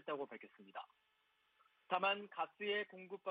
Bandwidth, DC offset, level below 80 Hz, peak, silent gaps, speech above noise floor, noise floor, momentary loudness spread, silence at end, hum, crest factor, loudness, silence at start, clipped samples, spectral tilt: 5 kHz; under 0.1%; under -90 dBFS; -22 dBFS; none; 36 dB; -79 dBFS; 17 LU; 0 s; none; 24 dB; -42 LUFS; 0.05 s; under 0.1%; -0.5 dB/octave